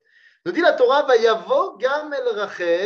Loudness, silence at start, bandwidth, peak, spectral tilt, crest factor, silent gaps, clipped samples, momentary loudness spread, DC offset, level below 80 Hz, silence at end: -19 LUFS; 0.45 s; 7 kHz; -2 dBFS; -3.5 dB/octave; 16 dB; none; under 0.1%; 9 LU; under 0.1%; -80 dBFS; 0 s